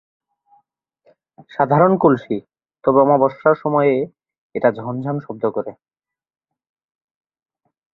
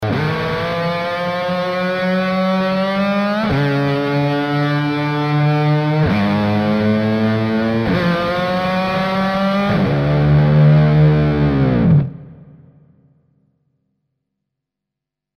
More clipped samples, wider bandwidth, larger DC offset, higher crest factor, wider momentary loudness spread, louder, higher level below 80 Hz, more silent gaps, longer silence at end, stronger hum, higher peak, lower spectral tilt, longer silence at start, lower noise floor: neither; second, 5.2 kHz vs 6.4 kHz; neither; about the same, 18 dB vs 14 dB; first, 14 LU vs 7 LU; about the same, -18 LUFS vs -16 LUFS; second, -60 dBFS vs -38 dBFS; first, 4.38-4.50 s vs none; second, 2.2 s vs 2.95 s; neither; about the same, -2 dBFS vs -2 dBFS; first, -10.5 dB/octave vs -8.5 dB/octave; first, 1.6 s vs 0 s; second, -64 dBFS vs -83 dBFS